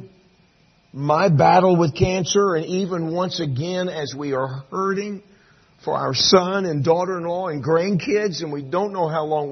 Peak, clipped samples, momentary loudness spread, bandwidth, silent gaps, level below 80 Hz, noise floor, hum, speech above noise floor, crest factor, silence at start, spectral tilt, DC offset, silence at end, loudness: -2 dBFS; under 0.1%; 12 LU; 6.4 kHz; none; -50 dBFS; -57 dBFS; none; 38 dB; 18 dB; 0 s; -5 dB/octave; under 0.1%; 0 s; -20 LUFS